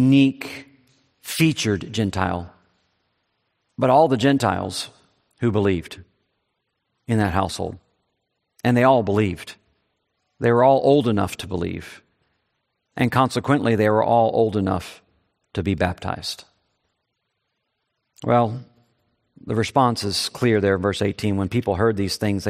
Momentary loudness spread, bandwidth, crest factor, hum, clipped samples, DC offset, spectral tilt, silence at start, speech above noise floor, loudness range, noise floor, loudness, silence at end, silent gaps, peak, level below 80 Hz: 18 LU; 15.5 kHz; 20 dB; none; under 0.1%; under 0.1%; -6 dB/octave; 0 s; 56 dB; 6 LU; -76 dBFS; -21 LUFS; 0 s; none; -2 dBFS; -54 dBFS